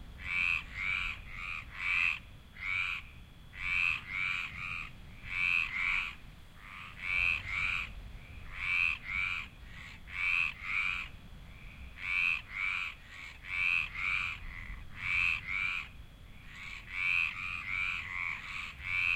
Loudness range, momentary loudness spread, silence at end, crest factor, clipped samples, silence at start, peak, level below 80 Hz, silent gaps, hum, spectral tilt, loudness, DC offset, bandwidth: 2 LU; 19 LU; 0 s; 18 dB; under 0.1%; 0 s; -18 dBFS; -52 dBFS; none; none; -2.5 dB/octave; -33 LUFS; under 0.1%; 16 kHz